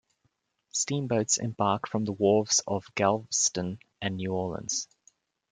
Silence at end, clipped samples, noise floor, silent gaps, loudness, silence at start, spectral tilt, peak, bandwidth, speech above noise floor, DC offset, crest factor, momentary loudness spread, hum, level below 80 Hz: 0.65 s; under 0.1%; -75 dBFS; none; -28 LUFS; 0.75 s; -3.5 dB/octave; -8 dBFS; 10.5 kHz; 47 dB; under 0.1%; 20 dB; 10 LU; none; -66 dBFS